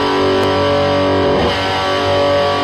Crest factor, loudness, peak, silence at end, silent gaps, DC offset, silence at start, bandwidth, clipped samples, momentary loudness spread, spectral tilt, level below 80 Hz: 10 dB; -14 LUFS; -4 dBFS; 0 s; none; under 0.1%; 0 s; 13 kHz; under 0.1%; 2 LU; -5.5 dB/octave; -38 dBFS